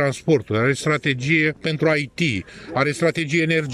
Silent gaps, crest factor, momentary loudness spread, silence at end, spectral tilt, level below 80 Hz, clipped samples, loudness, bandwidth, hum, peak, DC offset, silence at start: none; 16 dB; 4 LU; 0 s; -5.5 dB/octave; -54 dBFS; under 0.1%; -20 LUFS; 12.5 kHz; none; -6 dBFS; under 0.1%; 0 s